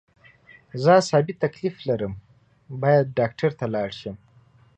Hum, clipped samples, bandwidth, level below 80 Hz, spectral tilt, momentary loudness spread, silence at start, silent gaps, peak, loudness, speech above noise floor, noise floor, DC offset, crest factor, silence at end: none; under 0.1%; 9.4 kHz; -58 dBFS; -6.5 dB/octave; 19 LU; 0.75 s; none; -4 dBFS; -23 LUFS; 34 dB; -56 dBFS; under 0.1%; 20 dB; 0.6 s